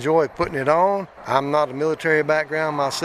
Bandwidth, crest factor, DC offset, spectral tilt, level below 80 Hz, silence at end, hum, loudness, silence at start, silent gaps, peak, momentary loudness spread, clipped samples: 14.5 kHz; 18 dB; under 0.1%; -5 dB/octave; -54 dBFS; 0 s; none; -21 LUFS; 0 s; none; -2 dBFS; 5 LU; under 0.1%